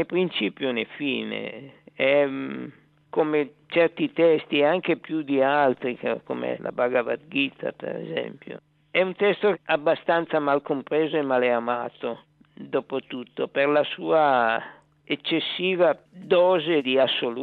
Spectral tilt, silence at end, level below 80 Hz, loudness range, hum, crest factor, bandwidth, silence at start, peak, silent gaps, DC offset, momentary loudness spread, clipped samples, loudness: -8 dB/octave; 0 s; -74 dBFS; 4 LU; none; 16 dB; 4.6 kHz; 0 s; -8 dBFS; none; under 0.1%; 12 LU; under 0.1%; -24 LUFS